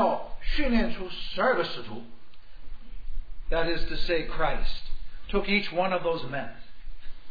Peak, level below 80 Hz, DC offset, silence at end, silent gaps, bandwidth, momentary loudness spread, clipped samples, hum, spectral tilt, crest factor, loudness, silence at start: -10 dBFS; -34 dBFS; 2%; 0 s; none; 5 kHz; 19 LU; under 0.1%; none; -6.5 dB/octave; 14 dB; -29 LUFS; 0 s